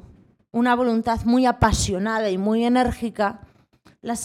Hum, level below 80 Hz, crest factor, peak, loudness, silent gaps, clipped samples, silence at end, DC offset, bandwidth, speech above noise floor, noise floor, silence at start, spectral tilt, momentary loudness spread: none; -38 dBFS; 20 dB; -2 dBFS; -21 LUFS; none; under 0.1%; 0 s; under 0.1%; 15 kHz; 36 dB; -56 dBFS; 0.55 s; -5 dB/octave; 7 LU